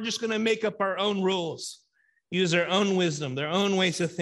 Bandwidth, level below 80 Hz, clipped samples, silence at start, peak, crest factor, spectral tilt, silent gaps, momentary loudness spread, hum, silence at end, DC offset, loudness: 12 kHz; -72 dBFS; under 0.1%; 0 s; -10 dBFS; 16 dB; -4.5 dB/octave; none; 8 LU; none; 0 s; under 0.1%; -26 LUFS